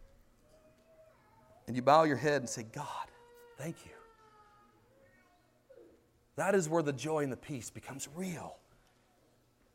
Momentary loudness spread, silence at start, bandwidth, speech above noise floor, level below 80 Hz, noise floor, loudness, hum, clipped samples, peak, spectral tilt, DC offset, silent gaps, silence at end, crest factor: 22 LU; 0 s; 16 kHz; 36 dB; -70 dBFS; -69 dBFS; -34 LUFS; none; under 0.1%; -12 dBFS; -5 dB/octave; under 0.1%; none; 1.2 s; 26 dB